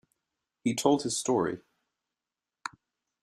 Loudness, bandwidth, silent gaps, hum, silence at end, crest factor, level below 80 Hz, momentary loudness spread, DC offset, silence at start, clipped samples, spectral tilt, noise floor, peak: -29 LUFS; 14.5 kHz; none; none; 0.55 s; 22 dB; -72 dBFS; 17 LU; under 0.1%; 0.65 s; under 0.1%; -4 dB/octave; under -90 dBFS; -10 dBFS